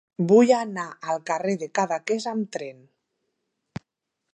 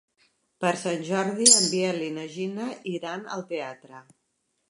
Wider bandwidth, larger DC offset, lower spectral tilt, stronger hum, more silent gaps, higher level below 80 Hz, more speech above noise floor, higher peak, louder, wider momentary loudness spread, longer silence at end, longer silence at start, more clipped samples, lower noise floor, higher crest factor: second, 10 kHz vs 11.5 kHz; neither; first, -5.5 dB/octave vs -2 dB/octave; neither; neither; first, -70 dBFS vs -80 dBFS; first, 58 dB vs 49 dB; second, -6 dBFS vs -2 dBFS; about the same, -23 LUFS vs -24 LUFS; first, 24 LU vs 17 LU; first, 1.6 s vs 0.7 s; second, 0.2 s vs 0.6 s; neither; first, -81 dBFS vs -75 dBFS; second, 18 dB vs 26 dB